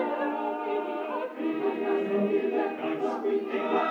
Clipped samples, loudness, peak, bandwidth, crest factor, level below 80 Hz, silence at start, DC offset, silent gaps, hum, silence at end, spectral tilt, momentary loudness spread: under 0.1%; -29 LUFS; -14 dBFS; 6.8 kHz; 16 dB; under -90 dBFS; 0 s; under 0.1%; none; none; 0 s; -7 dB/octave; 5 LU